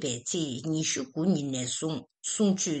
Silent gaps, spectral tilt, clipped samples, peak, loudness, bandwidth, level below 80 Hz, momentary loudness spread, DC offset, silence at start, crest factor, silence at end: none; -4 dB/octave; under 0.1%; -14 dBFS; -29 LUFS; 9.2 kHz; -70 dBFS; 7 LU; under 0.1%; 0 s; 16 dB; 0 s